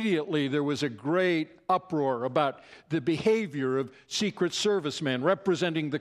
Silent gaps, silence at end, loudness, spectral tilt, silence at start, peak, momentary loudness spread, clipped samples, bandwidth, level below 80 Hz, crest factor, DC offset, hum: none; 0 s; -28 LUFS; -5 dB/octave; 0 s; -10 dBFS; 5 LU; under 0.1%; 13 kHz; -70 dBFS; 18 dB; under 0.1%; none